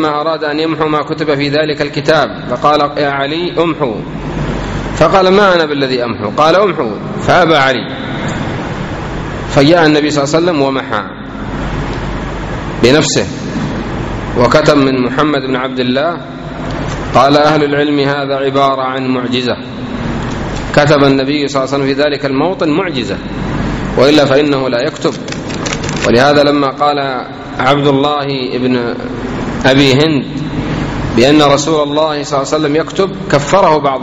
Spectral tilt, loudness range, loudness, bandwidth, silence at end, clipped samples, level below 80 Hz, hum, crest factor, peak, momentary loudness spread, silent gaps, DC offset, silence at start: -5.5 dB/octave; 3 LU; -12 LUFS; 9.6 kHz; 0 s; 0.3%; -32 dBFS; none; 12 dB; 0 dBFS; 11 LU; none; under 0.1%; 0 s